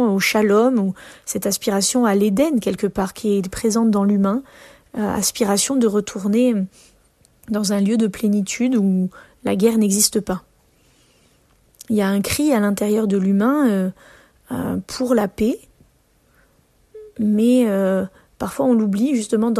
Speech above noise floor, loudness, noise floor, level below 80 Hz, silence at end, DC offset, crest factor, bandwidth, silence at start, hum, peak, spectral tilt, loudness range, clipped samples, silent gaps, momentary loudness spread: 40 dB; -19 LUFS; -58 dBFS; -52 dBFS; 0 s; under 0.1%; 18 dB; 14 kHz; 0 s; none; -2 dBFS; -5 dB/octave; 3 LU; under 0.1%; none; 11 LU